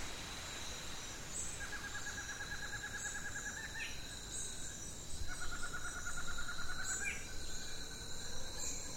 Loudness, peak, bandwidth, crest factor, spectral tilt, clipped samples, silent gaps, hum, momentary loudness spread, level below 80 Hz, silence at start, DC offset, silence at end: -43 LUFS; -26 dBFS; 16 kHz; 14 dB; -1.5 dB/octave; under 0.1%; none; none; 4 LU; -50 dBFS; 0 s; under 0.1%; 0 s